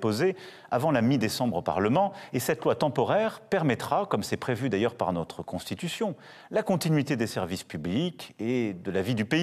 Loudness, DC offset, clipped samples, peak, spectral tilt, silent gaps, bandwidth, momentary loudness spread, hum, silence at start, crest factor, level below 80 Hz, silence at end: -28 LUFS; under 0.1%; under 0.1%; -8 dBFS; -6 dB/octave; none; 14.5 kHz; 8 LU; none; 0 s; 18 dB; -62 dBFS; 0 s